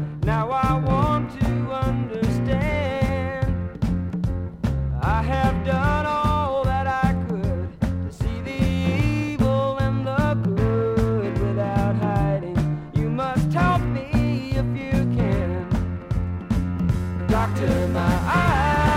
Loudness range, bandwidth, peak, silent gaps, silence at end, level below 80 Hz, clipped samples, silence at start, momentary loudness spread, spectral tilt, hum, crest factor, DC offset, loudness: 2 LU; 15 kHz; -8 dBFS; none; 0 s; -32 dBFS; under 0.1%; 0 s; 6 LU; -8 dB/octave; none; 14 dB; under 0.1%; -23 LUFS